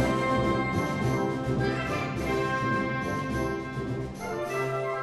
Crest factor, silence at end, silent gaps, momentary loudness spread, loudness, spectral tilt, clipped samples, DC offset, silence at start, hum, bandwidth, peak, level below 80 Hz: 14 dB; 0 s; none; 7 LU; -29 LUFS; -6.5 dB/octave; under 0.1%; under 0.1%; 0 s; none; 14 kHz; -14 dBFS; -46 dBFS